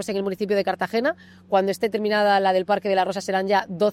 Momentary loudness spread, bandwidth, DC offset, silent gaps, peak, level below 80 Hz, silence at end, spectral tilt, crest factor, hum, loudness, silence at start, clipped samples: 6 LU; 15.5 kHz; under 0.1%; none; -8 dBFS; -68 dBFS; 0 s; -5 dB/octave; 14 dB; none; -22 LUFS; 0 s; under 0.1%